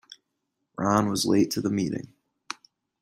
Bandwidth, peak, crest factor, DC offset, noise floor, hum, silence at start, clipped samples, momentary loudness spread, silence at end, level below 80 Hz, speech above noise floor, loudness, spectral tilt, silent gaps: 15.5 kHz; -6 dBFS; 22 dB; under 0.1%; -80 dBFS; none; 0.1 s; under 0.1%; 17 LU; 0.95 s; -62 dBFS; 56 dB; -25 LUFS; -5 dB/octave; none